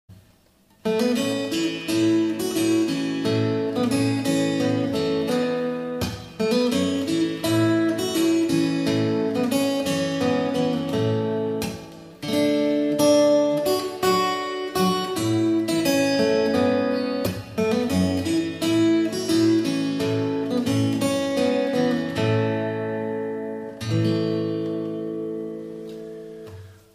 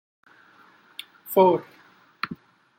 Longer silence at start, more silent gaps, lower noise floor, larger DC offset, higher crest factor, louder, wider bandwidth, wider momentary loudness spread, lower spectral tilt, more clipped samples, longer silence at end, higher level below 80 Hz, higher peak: second, 0.1 s vs 1.25 s; neither; about the same, -58 dBFS vs -56 dBFS; neither; second, 14 dB vs 22 dB; about the same, -23 LUFS vs -23 LUFS; about the same, 15.5 kHz vs 16.5 kHz; second, 9 LU vs 23 LU; about the same, -5.5 dB/octave vs -6 dB/octave; neither; second, 0.2 s vs 0.45 s; first, -56 dBFS vs -76 dBFS; about the same, -8 dBFS vs -6 dBFS